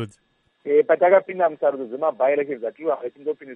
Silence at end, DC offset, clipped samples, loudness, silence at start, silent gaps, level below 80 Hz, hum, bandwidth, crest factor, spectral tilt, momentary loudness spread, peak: 0 s; under 0.1%; under 0.1%; -21 LUFS; 0 s; none; -78 dBFS; none; 8.2 kHz; 18 dB; -7.5 dB/octave; 13 LU; -4 dBFS